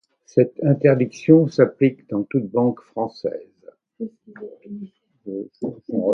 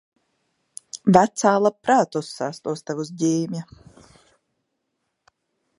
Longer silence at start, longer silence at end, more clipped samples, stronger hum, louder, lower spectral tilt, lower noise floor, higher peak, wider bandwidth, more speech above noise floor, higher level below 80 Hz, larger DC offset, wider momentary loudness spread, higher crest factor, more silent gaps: second, 0.35 s vs 0.95 s; second, 0 s vs 2.15 s; neither; neither; about the same, -20 LUFS vs -21 LUFS; first, -9 dB/octave vs -5.5 dB/octave; second, -49 dBFS vs -77 dBFS; about the same, 0 dBFS vs 0 dBFS; second, 7 kHz vs 11.5 kHz; second, 29 dB vs 56 dB; about the same, -64 dBFS vs -64 dBFS; neither; first, 21 LU vs 17 LU; about the same, 20 dB vs 24 dB; neither